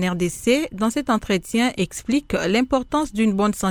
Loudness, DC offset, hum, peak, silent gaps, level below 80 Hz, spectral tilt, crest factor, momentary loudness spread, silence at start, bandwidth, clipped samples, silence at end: -21 LUFS; under 0.1%; none; -4 dBFS; none; -44 dBFS; -5 dB/octave; 16 dB; 3 LU; 0 s; 19 kHz; under 0.1%; 0 s